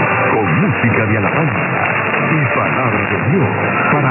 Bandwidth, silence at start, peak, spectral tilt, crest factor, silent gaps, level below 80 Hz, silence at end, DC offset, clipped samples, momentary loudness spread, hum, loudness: 3.2 kHz; 0 s; -2 dBFS; -12.5 dB/octave; 12 dB; none; -42 dBFS; 0 s; under 0.1%; under 0.1%; 2 LU; none; -14 LUFS